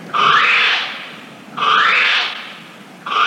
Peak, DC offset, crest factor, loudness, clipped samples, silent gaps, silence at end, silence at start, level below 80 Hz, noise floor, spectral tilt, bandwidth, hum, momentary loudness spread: -2 dBFS; under 0.1%; 14 dB; -13 LUFS; under 0.1%; none; 0 s; 0 s; -76 dBFS; -38 dBFS; -1.5 dB/octave; 15 kHz; none; 21 LU